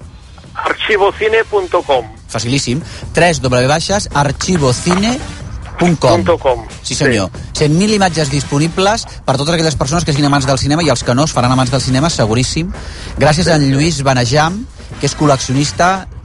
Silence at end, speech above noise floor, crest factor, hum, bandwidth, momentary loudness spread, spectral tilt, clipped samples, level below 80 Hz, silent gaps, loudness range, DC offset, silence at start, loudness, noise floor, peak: 0 s; 22 dB; 14 dB; none; 11.5 kHz; 9 LU; -5 dB/octave; under 0.1%; -32 dBFS; none; 1 LU; under 0.1%; 0 s; -13 LUFS; -34 dBFS; 0 dBFS